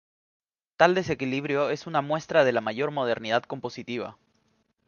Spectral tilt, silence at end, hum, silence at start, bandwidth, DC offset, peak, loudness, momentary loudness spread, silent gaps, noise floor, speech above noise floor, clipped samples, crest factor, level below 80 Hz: -5.5 dB/octave; 0.75 s; none; 0.8 s; 7.2 kHz; under 0.1%; -4 dBFS; -26 LUFS; 13 LU; none; -70 dBFS; 45 dB; under 0.1%; 24 dB; -66 dBFS